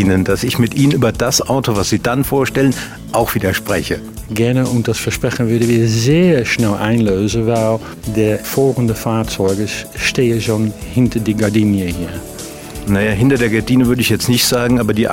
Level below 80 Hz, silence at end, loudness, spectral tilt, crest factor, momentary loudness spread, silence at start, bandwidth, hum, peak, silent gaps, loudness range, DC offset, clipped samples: -36 dBFS; 0 s; -15 LUFS; -5.5 dB/octave; 12 dB; 8 LU; 0 s; 16.5 kHz; none; -2 dBFS; none; 2 LU; under 0.1%; under 0.1%